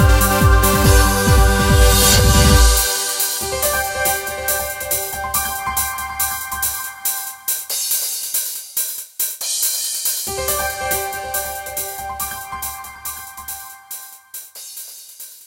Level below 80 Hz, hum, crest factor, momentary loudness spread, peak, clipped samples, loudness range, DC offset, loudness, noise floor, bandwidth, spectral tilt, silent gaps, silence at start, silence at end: -22 dBFS; none; 18 dB; 19 LU; 0 dBFS; under 0.1%; 13 LU; under 0.1%; -17 LUFS; -38 dBFS; 17 kHz; -3 dB/octave; none; 0 s; 0.1 s